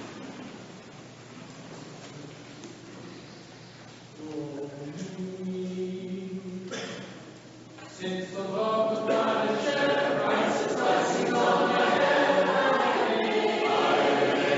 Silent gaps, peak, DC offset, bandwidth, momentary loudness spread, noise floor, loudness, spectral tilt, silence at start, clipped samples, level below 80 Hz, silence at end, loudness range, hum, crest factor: none; -10 dBFS; under 0.1%; 8 kHz; 22 LU; -47 dBFS; -26 LUFS; -3 dB/octave; 0 s; under 0.1%; -72 dBFS; 0 s; 20 LU; none; 18 dB